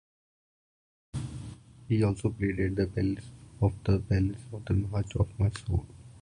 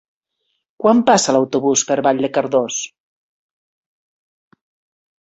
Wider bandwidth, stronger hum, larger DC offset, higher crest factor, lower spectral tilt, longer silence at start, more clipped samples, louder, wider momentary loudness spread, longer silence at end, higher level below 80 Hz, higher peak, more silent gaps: first, 10.5 kHz vs 8.2 kHz; neither; neither; about the same, 18 dB vs 18 dB; first, -8 dB/octave vs -3.5 dB/octave; first, 1.15 s vs 0.8 s; neither; second, -30 LUFS vs -16 LUFS; first, 14 LU vs 9 LU; second, 0 s vs 2.35 s; first, -42 dBFS vs -62 dBFS; second, -12 dBFS vs -2 dBFS; neither